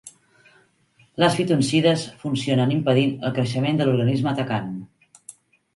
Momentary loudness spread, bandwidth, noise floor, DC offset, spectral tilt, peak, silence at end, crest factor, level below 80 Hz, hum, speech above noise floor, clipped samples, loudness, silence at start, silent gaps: 9 LU; 11.5 kHz; -60 dBFS; under 0.1%; -6 dB/octave; -4 dBFS; 0.45 s; 20 dB; -60 dBFS; none; 39 dB; under 0.1%; -21 LUFS; 0.05 s; none